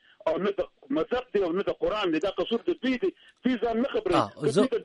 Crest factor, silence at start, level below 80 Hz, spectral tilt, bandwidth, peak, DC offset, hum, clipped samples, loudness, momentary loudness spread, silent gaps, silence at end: 18 dB; 0.25 s; -56 dBFS; -6 dB/octave; 11.5 kHz; -10 dBFS; under 0.1%; none; under 0.1%; -28 LUFS; 5 LU; none; 0 s